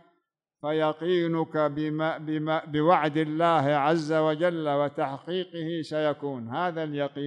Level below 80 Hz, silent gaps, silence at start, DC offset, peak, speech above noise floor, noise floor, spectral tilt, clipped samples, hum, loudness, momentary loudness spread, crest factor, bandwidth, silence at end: -72 dBFS; none; 0.65 s; under 0.1%; -10 dBFS; 49 dB; -76 dBFS; -7 dB/octave; under 0.1%; none; -27 LUFS; 9 LU; 18 dB; 9.8 kHz; 0 s